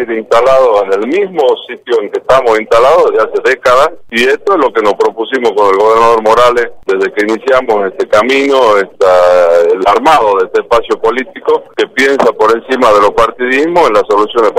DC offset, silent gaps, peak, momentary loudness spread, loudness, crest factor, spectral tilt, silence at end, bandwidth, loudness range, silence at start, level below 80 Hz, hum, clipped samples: under 0.1%; none; 0 dBFS; 6 LU; -9 LUFS; 8 dB; -4 dB/octave; 0 s; 15 kHz; 1 LU; 0 s; -42 dBFS; none; 0.2%